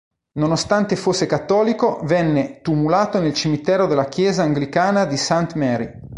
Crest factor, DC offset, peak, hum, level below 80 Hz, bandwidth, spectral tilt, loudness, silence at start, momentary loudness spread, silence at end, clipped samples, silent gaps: 16 dB; under 0.1%; -2 dBFS; none; -50 dBFS; 11.5 kHz; -5.5 dB/octave; -19 LUFS; 0.35 s; 4 LU; 0 s; under 0.1%; none